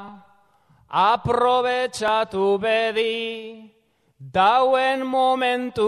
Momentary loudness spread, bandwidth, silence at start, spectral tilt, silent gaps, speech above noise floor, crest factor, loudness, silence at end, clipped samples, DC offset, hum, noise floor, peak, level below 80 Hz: 9 LU; 13 kHz; 0 s; -4.5 dB/octave; none; 38 dB; 16 dB; -20 LUFS; 0 s; under 0.1%; under 0.1%; none; -58 dBFS; -6 dBFS; -56 dBFS